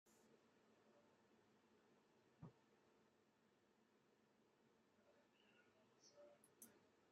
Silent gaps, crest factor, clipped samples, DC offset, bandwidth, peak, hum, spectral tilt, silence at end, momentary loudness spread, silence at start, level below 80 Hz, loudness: none; 26 dB; under 0.1%; under 0.1%; 7.6 kHz; -48 dBFS; none; -5 dB/octave; 0 s; 2 LU; 0.05 s; under -90 dBFS; -68 LUFS